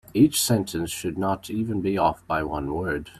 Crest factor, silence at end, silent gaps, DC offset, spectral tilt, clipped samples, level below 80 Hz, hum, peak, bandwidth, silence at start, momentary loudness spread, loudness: 18 dB; 0 s; none; under 0.1%; -5 dB/octave; under 0.1%; -48 dBFS; none; -6 dBFS; 16 kHz; 0.1 s; 9 LU; -25 LUFS